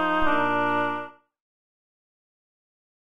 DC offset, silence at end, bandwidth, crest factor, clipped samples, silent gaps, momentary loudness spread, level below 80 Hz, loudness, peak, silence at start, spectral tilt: under 0.1%; 1.65 s; 13.5 kHz; 18 dB; under 0.1%; none; 11 LU; -48 dBFS; -24 LUFS; -8 dBFS; 0 s; -6 dB/octave